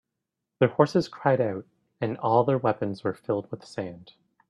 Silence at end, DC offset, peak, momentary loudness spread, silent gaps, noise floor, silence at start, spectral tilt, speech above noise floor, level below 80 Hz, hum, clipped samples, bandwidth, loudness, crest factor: 0.45 s; under 0.1%; -6 dBFS; 13 LU; none; -84 dBFS; 0.6 s; -7.5 dB/octave; 59 dB; -68 dBFS; none; under 0.1%; 11 kHz; -26 LUFS; 20 dB